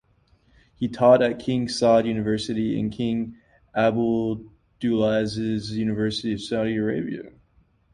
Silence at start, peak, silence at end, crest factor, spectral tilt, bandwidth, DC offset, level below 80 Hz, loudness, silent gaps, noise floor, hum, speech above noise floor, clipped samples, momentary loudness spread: 0.8 s; -4 dBFS; 0.65 s; 20 dB; -6.5 dB/octave; 11 kHz; under 0.1%; -54 dBFS; -23 LUFS; none; -61 dBFS; none; 39 dB; under 0.1%; 11 LU